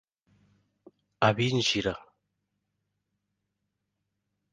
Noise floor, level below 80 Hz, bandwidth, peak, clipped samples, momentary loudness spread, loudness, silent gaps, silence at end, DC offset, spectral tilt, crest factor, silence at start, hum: -82 dBFS; -60 dBFS; 9.8 kHz; -8 dBFS; under 0.1%; 9 LU; -27 LUFS; none; 2.55 s; under 0.1%; -4.5 dB/octave; 26 dB; 1.2 s; 50 Hz at -65 dBFS